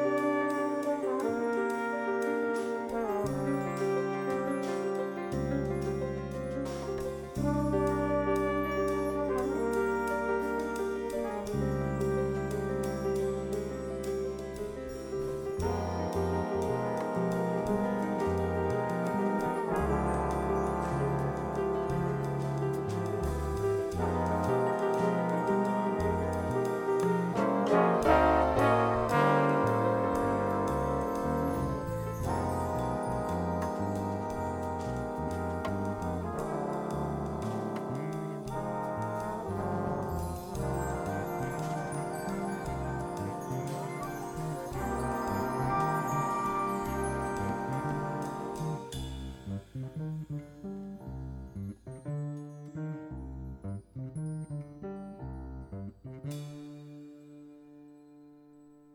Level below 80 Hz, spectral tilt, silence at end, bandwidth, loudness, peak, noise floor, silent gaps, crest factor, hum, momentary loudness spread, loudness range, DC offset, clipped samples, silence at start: -48 dBFS; -7 dB/octave; 0.25 s; 19 kHz; -32 LUFS; -12 dBFS; -56 dBFS; none; 20 dB; none; 12 LU; 13 LU; under 0.1%; under 0.1%; 0 s